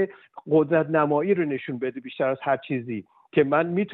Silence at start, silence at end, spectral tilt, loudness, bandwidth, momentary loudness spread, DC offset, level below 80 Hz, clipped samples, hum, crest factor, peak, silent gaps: 0 s; 0 s; -6 dB/octave; -24 LUFS; 4.1 kHz; 10 LU; under 0.1%; -70 dBFS; under 0.1%; none; 16 dB; -8 dBFS; none